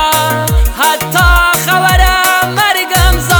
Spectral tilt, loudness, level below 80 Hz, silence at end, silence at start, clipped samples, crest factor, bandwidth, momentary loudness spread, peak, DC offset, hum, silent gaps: -3 dB/octave; -9 LUFS; -16 dBFS; 0 s; 0 s; 0.9%; 10 dB; over 20 kHz; 4 LU; 0 dBFS; under 0.1%; none; none